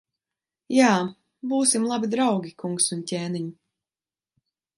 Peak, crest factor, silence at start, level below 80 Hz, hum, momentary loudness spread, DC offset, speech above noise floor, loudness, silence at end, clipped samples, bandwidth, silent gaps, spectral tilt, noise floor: -4 dBFS; 20 dB; 0.7 s; -74 dBFS; none; 13 LU; under 0.1%; over 67 dB; -23 LUFS; 1.25 s; under 0.1%; 11.5 kHz; none; -4 dB/octave; under -90 dBFS